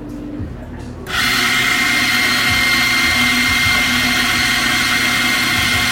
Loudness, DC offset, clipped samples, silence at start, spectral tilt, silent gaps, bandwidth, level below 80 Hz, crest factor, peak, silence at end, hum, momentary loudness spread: -13 LUFS; under 0.1%; under 0.1%; 0 s; -1.5 dB/octave; none; 16.5 kHz; -36 dBFS; 14 dB; -2 dBFS; 0 s; none; 16 LU